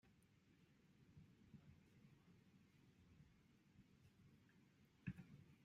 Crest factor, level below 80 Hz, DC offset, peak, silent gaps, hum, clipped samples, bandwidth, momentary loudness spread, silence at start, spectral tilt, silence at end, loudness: 28 dB; -82 dBFS; under 0.1%; -38 dBFS; none; none; under 0.1%; 7.4 kHz; 12 LU; 0.05 s; -7 dB/octave; 0 s; -61 LUFS